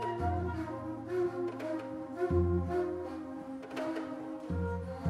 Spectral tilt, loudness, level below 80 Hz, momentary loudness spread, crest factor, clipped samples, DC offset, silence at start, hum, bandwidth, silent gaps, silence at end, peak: -8.5 dB/octave; -36 LUFS; -50 dBFS; 10 LU; 18 dB; under 0.1%; under 0.1%; 0 s; none; 11 kHz; none; 0 s; -18 dBFS